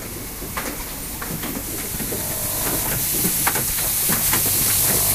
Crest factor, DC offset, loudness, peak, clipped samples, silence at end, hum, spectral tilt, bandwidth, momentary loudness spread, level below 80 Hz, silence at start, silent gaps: 18 dB; under 0.1%; -20 LUFS; -4 dBFS; under 0.1%; 0 s; none; -2 dB/octave; 16 kHz; 12 LU; -38 dBFS; 0 s; none